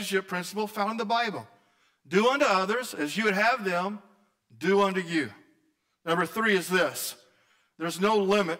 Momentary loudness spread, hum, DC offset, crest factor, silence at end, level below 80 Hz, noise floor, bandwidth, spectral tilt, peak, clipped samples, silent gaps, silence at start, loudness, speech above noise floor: 11 LU; none; under 0.1%; 14 dB; 0 s; -72 dBFS; -72 dBFS; 16 kHz; -4 dB/octave; -14 dBFS; under 0.1%; none; 0 s; -27 LUFS; 45 dB